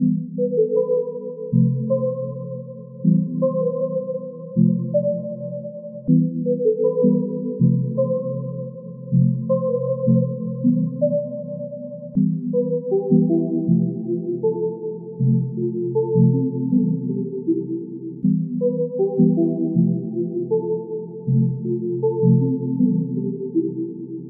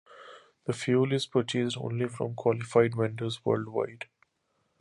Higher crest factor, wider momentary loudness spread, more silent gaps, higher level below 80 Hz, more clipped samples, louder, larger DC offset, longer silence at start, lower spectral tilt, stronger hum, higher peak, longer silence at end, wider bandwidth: second, 16 dB vs 22 dB; second, 12 LU vs 15 LU; neither; about the same, -64 dBFS vs -68 dBFS; neither; first, -21 LUFS vs -29 LUFS; neither; about the same, 0 s vs 0.1 s; first, -18.5 dB/octave vs -6 dB/octave; neither; first, -4 dBFS vs -8 dBFS; second, 0 s vs 0.75 s; second, 1.1 kHz vs 11.5 kHz